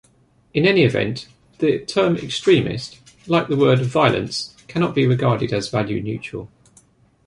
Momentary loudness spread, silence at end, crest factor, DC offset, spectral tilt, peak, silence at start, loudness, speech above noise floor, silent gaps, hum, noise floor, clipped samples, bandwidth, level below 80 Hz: 11 LU; 0.8 s; 18 dB; under 0.1%; -6 dB/octave; -2 dBFS; 0.55 s; -19 LUFS; 38 dB; none; none; -57 dBFS; under 0.1%; 11.5 kHz; -52 dBFS